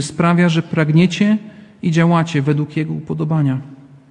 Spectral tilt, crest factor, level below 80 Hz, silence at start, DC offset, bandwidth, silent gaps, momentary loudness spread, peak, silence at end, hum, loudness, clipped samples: -7 dB/octave; 14 dB; -56 dBFS; 0 s; under 0.1%; 10 kHz; none; 9 LU; -2 dBFS; 0.35 s; none; -16 LUFS; under 0.1%